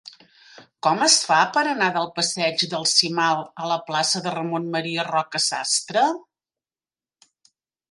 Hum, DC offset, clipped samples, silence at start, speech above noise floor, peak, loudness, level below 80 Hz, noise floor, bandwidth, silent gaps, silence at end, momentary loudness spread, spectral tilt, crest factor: none; under 0.1%; under 0.1%; 0.05 s; over 68 dB; -2 dBFS; -21 LUFS; -76 dBFS; under -90 dBFS; 11.5 kHz; none; 1.7 s; 9 LU; -2 dB/octave; 20 dB